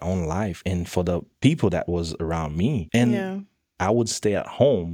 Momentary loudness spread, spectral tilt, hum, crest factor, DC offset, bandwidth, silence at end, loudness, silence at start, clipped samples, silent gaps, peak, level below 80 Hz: 7 LU; -6 dB/octave; none; 20 dB; under 0.1%; 16 kHz; 0 s; -24 LUFS; 0 s; under 0.1%; none; -4 dBFS; -44 dBFS